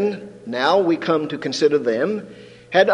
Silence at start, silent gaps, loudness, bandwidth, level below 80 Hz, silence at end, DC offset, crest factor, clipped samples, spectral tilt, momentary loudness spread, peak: 0 s; none; -20 LUFS; 10 kHz; -66 dBFS; 0 s; under 0.1%; 16 dB; under 0.1%; -5 dB/octave; 12 LU; -2 dBFS